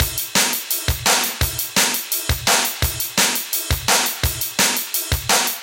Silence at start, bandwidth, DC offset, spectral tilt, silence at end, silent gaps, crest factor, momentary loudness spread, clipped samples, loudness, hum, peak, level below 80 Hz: 0 s; 17.5 kHz; under 0.1%; -1.5 dB/octave; 0 s; none; 20 dB; 4 LU; under 0.1%; -18 LUFS; none; 0 dBFS; -32 dBFS